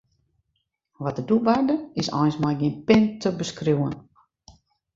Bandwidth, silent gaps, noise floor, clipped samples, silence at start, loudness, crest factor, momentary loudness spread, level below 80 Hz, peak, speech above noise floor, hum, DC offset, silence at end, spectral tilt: 7.8 kHz; none; -76 dBFS; under 0.1%; 1 s; -23 LUFS; 22 dB; 11 LU; -56 dBFS; -2 dBFS; 54 dB; none; under 0.1%; 0.45 s; -6.5 dB/octave